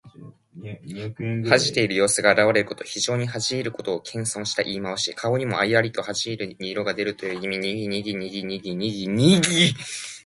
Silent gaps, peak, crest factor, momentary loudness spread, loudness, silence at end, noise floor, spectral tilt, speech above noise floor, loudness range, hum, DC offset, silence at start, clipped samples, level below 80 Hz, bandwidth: none; 0 dBFS; 22 dB; 13 LU; -23 LUFS; 0.05 s; -45 dBFS; -4 dB/octave; 22 dB; 4 LU; none; under 0.1%; 0.05 s; under 0.1%; -58 dBFS; 11.5 kHz